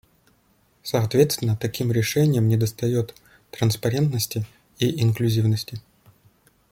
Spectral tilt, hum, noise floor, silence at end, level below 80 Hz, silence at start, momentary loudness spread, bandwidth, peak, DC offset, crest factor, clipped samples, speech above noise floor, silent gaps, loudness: -6 dB/octave; none; -62 dBFS; 0.9 s; -56 dBFS; 0.85 s; 14 LU; 16.5 kHz; -4 dBFS; under 0.1%; 20 dB; under 0.1%; 41 dB; none; -23 LUFS